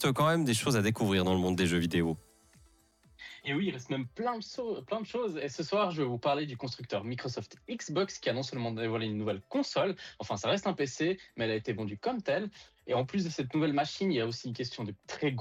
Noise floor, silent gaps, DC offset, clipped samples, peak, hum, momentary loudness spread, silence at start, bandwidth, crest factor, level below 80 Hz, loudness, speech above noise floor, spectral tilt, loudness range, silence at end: -65 dBFS; none; under 0.1%; under 0.1%; -18 dBFS; none; 10 LU; 0 s; 16 kHz; 14 dB; -68 dBFS; -33 LUFS; 32 dB; -5.5 dB/octave; 4 LU; 0 s